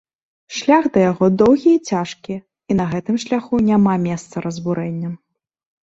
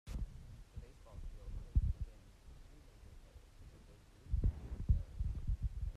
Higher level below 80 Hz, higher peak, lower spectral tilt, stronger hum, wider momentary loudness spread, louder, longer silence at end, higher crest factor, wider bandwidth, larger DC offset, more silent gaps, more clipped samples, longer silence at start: second, -52 dBFS vs -42 dBFS; first, -2 dBFS vs -20 dBFS; second, -6.5 dB/octave vs -8 dB/octave; neither; second, 16 LU vs 23 LU; first, -17 LUFS vs -42 LUFS; first, 0.7 s vs 0 s; about the same, 16 dB vs 20 dB; second, 8 kHz vs 9.8 kHz; neither; neither; neither; first, 0.5 s vs 0.05 s